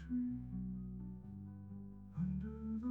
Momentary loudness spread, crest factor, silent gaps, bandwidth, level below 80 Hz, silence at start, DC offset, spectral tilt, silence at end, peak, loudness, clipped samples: 10 LU; 14 dB; none; 3.2 kHz; -56 dBFS; 0 s; under 0.1%; -11 dB/octave; 0 s; -30 dBFS; -45 LUFS; under 0.1%